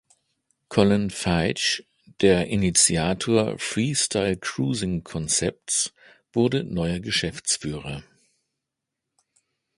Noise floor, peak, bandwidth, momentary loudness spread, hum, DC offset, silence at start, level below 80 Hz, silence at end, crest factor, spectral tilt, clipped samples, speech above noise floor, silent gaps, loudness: -84 dBFS; -2 dBFS; 11.5 kHz; 9 LU; none; under 0.1%; 0.7 s; -46 dBFS; 1.75 s; 22 dB; -3.5 dB/octave; under 0.1%; 61 dB; none; -23 LUFS